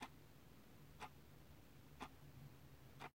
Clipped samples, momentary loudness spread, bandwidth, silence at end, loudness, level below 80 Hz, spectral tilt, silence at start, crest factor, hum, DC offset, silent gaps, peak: under 0.1%; 7 LU; 16 kHz; 0 s; -61 LUFS; -72 dBFS; -4.5 dB/octave; 0 s; 22 dB; none; under 0.1%; none; -38 dBFS